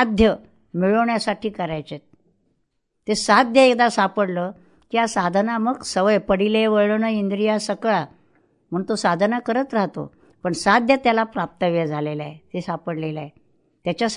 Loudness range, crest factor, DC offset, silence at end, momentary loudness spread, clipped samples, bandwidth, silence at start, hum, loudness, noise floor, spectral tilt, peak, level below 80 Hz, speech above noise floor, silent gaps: 4 LU; 20 dB; under 0.1%; 0 s; 15 LU; under 0.1%; 11 kHz; 0 s; none; -20 LUFS; -72 dBFS; -5 dB/octave; -2 dBFS; -48 dBFS; 52 dB; none